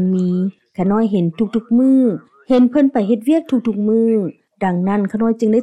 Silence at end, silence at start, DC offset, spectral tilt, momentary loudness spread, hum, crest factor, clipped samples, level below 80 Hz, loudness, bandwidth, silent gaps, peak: 0 s; 0 s; under 0.1%; -9 dB/octave; 7 LU; none; 12 dB; under 0.1%; -56 dBFS; -16 LUFS; 10.5 kHz; none; -4 dBFS